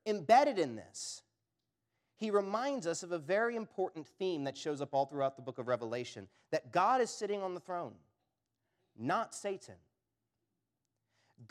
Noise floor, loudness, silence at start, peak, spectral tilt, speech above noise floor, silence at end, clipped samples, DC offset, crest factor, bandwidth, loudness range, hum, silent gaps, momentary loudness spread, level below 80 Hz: -87 dBFS; -35 LUFS; 0.05 s; -14 dBFS; -4.5 dB/octave; 52 dB; 0.05 s; under 0.1%; under 0.1%; 24 dB; 13.5 kHz; 7 LU; none; none; 13 LU; -90 dBFS